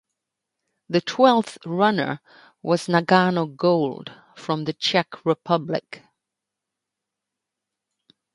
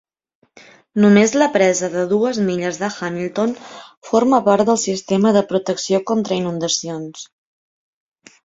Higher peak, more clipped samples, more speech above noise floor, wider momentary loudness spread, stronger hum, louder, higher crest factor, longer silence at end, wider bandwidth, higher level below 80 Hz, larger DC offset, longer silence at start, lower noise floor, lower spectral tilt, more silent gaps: about the same, -2 dBFS vs -2 dBFS; neither; first, 63 dB vs 30 dB; first, 18 LU vs 14 LU; neither; second, -22 LUFS vs -17 LUFS; first, 22 dB vs 16 dB; first, 2.35 s vs 1.2 s; first, 11.5 kHz vs 7.8 kHz; second, -70 dBFS vs -60 dBFS; neither; about the same, 0.9 s vs 0.95 s; first, -85 dBFS vs -47 dBFS; first, -6 dB/octave vs -4.5 dB/octave; second, none vs 3.97-4.02 s